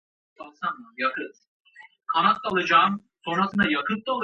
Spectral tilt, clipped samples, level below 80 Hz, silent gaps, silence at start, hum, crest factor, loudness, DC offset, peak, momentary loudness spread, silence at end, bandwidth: -5.5 dB/octave; under 0.1%; -64 dBFS; 1.48-1.65 s; 0.4 s; none; 20 dB; -24 LUFS; under 0.1%; -6 dBFS; 14 LU; 0 s; 7.6 kHz